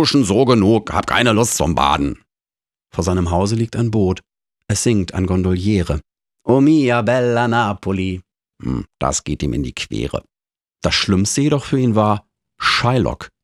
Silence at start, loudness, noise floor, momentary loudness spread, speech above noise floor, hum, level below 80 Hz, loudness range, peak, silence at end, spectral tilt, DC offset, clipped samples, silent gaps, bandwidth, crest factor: 0 s; -17 LUFS; under -90 dBFS; 11 LU; over 74 dB; none; -36 dBFS; 4 LU; 0 dBFS; 0.15 s; -5 dB/octave; under 0.1%; under 0.1%; none; 14 kHz; 16 dB